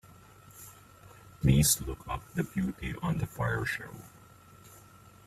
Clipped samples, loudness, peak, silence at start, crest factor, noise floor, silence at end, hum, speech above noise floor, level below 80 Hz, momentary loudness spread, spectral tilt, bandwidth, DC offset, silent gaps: under 0.1%; -30 LUFS; -10 dBFS; 0.55 s; 22 dB; -55 dBFS; 0.5 s; none; 25 dB; -46 dBFS; 25 LU; -4.5 dB/octave; 16 kHz; under 0.1%; none